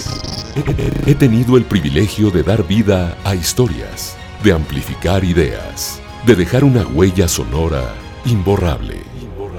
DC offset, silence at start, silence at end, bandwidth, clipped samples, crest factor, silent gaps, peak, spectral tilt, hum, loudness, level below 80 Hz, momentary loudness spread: under 0.1%; 0 s; 0 s; 19.5 kHz; under 0.1%; 14 dB; none; 0 dBFS; -6 dB/octave; none; -15 LUFS; -28 dBFS; 12 LU